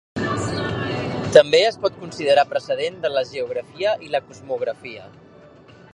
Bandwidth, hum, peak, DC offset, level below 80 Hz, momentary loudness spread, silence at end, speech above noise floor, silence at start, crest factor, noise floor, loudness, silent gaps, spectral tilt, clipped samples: 11 kHz; none; 0 dBFS; under 0.1%; -52 dBFS; 13 LU; 0.85 s; 26 dB; 0.15 s; 22 dB; -46 dBFS; -21 LUFS; none; -4.5 dB/octave; under 0.1%